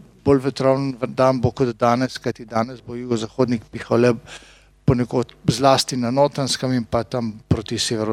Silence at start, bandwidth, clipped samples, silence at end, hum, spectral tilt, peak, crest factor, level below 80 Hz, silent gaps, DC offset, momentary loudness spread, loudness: 0.25 s; 15 kHz; under 0.1%; 0 s; none; -5.5 dB/octave; -2 dBFS; 20 dB; -46 dBFS; none; under 0.1%; 8 LU; -21 LUFS